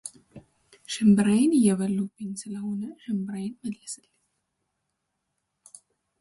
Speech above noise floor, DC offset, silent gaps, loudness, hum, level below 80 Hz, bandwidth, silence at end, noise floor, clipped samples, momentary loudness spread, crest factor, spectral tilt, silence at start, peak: 55 dB; under 0.1%; none; -25 LUFS; none; -66 dBFS; 11.5 kHz; 2.25 s; -80 dBFS; under 0.1%; 17 LU; 18 dB; -6 dB/octave; 0.05 s; -10 dBFS